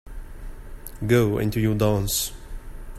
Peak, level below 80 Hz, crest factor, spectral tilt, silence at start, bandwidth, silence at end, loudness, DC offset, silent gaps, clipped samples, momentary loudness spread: -6 dBFS; -36 dBFS; 18 dB; -5 dB/octave; 0.05 s; 15.5 kHz; 0 s; -23 LUFS; under 0.1%; none; under 0.1%; 22 LU